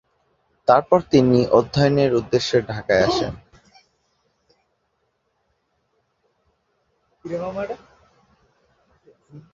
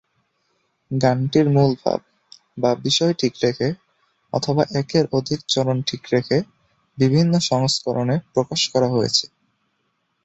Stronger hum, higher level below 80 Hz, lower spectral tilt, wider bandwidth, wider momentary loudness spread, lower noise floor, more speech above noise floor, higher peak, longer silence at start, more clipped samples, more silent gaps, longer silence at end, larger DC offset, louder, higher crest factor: neither; first, -50 dBFS vs -56 dBFS; about the same, -6.5 dB/octave vs -5.5 dB/octave; about the same, 7.6 kHz vs 8.2 kHz; first, 16 LU vs 8 LU; about the same, -71 dBFS vs -70 dBFS; about the same, 53 dB vs 51 dB; about the same, -2 dBFS vs -2 dBFS; second, 0.7 s vs 0.9 s; neither; neither; second, 0.15 s vs 1 s; neither; about the same, -19 LUFS vs -20 LUFS; about the same, 22 dB vs 18 dB